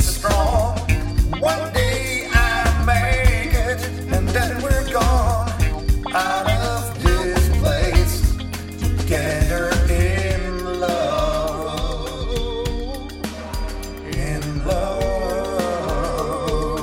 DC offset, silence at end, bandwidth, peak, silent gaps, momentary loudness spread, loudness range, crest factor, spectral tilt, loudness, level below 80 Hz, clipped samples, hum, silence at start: under 0.1%; 0 s; 16.5 kHz; -2 dBFS; none; 9 LU; 6 LU; 18 dB; -5 dB/octave; -21 LUFS; -22 dBFS; under 0.1%; none; 0 s